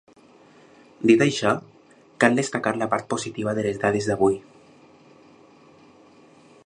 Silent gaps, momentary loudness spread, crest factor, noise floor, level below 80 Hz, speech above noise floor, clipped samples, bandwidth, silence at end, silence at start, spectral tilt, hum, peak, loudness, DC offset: none; 9 LU; 24 dB; -53 dBFS; -60 dBFS; 32 dB; under 0.1%; 11 kHz; 2.25 s; 1 s; -5 dB/octave; none; -2 dBFS; -22 LUFS; under 0.1%